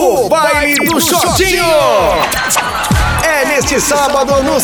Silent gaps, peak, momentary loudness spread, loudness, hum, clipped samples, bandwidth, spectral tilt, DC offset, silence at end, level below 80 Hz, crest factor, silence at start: none; 0 dBFS; 3 LU; -11 LUFS; none; under 0.1%; over 20 kHz; -3 dB/octave; 0.3%; 0 s; -26 dBFS; 10 dB; 0 s